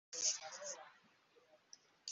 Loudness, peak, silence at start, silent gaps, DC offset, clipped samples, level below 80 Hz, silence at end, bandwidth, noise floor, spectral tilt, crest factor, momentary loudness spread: -42 LUFS; -24 dBFS; 0.1 s; none; under 0.1%; under 0.1%; under -90 dBFS; 0 s; 8.2 kHz; -72 dBFS; 2.5 dB/octave; 24 dB; 25 LU